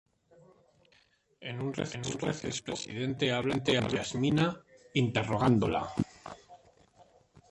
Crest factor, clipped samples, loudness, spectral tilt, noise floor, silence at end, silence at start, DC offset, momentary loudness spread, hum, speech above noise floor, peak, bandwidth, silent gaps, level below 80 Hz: 22 dB; under 0.1%; -31 LUFS; -5.5 dB/octave; -68 dBFS; 0.5 s; 1.4 s; under 0.1%; 14 LU; none; 37 dB; -12 dBFS; 11.5 kHz; none; -58 dBFS